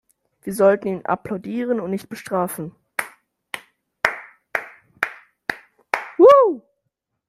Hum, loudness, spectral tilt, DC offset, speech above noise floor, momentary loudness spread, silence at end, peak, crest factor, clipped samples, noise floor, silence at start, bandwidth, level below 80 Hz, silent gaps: none; -20 LUFS; -5.5 dB/octave; under 0.1%; 55 dB; 21 LU; 0.7 s; 0 dBFS; 20 dB; under 0.1%; -77 dBFS; 0.45 s; 16 kHz; -64 dBFS; none